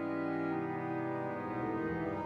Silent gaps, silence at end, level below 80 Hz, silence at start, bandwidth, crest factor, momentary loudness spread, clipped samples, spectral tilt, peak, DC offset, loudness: none; 0 s; -66 dBFS; 0 s; 5.8 kHz; 12 dB; 2 LU; under 0.1%; -9 dB/octave; -24 dBFS; under 0.1%; -37 LUFS